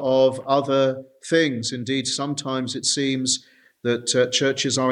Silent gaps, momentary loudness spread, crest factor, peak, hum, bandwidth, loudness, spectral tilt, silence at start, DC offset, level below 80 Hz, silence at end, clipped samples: none; 7 LU; 18 dB; -4 dBFS; none; 11 kHz; -22 LUFS; -3.5 dB/octave; 0 s; under 0.1%; -68 dBFS; 0 s; under 0.1%